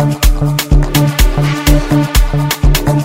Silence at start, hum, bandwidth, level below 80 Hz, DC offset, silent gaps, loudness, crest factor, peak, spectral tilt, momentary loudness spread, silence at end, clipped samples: 0 s; none; 16.5 kHz; -12 dBFS; under 0.1%; none; -12 LUFS; 10 dB; 0 dBFS; -5 dB/octave; 2 LU; 0 s; under 0.1%